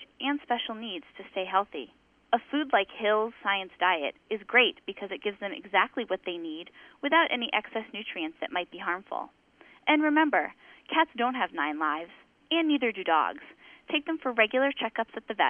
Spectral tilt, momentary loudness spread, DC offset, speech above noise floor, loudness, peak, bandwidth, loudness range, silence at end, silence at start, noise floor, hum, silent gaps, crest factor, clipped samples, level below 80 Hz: -6 dB/octave; 14 LU; under 0.1%; 20 dB; -28 LUFS; -8 dBFS; 3.8 kHz; 3 LU; 0 s; 0 s; -49 dBFS; none; none; 20 dB; under 0.1%; -74 dBFS